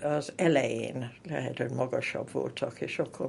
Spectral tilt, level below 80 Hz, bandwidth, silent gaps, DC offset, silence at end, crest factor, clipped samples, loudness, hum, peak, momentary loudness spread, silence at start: -6 dB/octave; -70 dBFS; 11.5 kHz; none; under 0.1%; 0 s; 20 dB; under 0.1%; -31 LUFS; none; -10 dBFS; 10 LU; 0 s